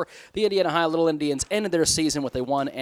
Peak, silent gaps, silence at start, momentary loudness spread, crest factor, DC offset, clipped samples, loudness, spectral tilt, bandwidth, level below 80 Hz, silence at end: -8 dBFS; none; 0 s; 5 LU; 16 dB; under 0.1%; under 0.1%; -23 LUFS; -3.5 dB/octave; 16.5 kHz; -52 dBFS; 0 s